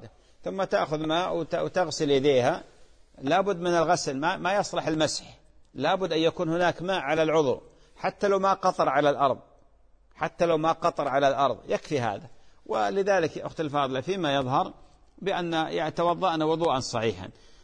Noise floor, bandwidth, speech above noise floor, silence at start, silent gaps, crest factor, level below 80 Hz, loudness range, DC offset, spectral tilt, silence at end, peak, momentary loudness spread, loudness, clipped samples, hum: -58 dBFS; 10.5 kHz; 32 dB; 0 s; none; 18 dB; -58 dBFS; 2 LU; under 0.1%; -5 dB/octave; 0.3 s; -8 dBFS; 10 LU; -26 LUFS; under 0.1%; none